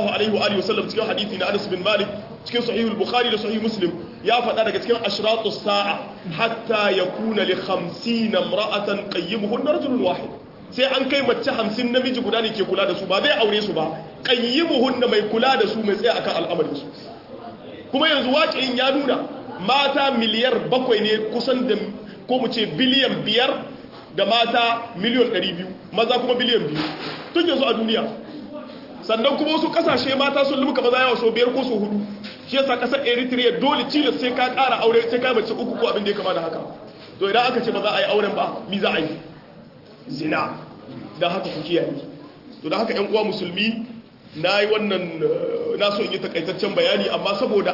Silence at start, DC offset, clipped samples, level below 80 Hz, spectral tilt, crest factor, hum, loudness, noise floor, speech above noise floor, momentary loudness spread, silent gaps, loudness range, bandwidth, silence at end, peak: 0 s; under 0.1%; under 0.1%; -62 dBFS; -5.5 dB/octave; 16 dB; none; -21 LUFS; -44 dBFS; 23 dB; 12 LU; none; 4 LU; 5.8 kHz; 0 s; -4 dBFS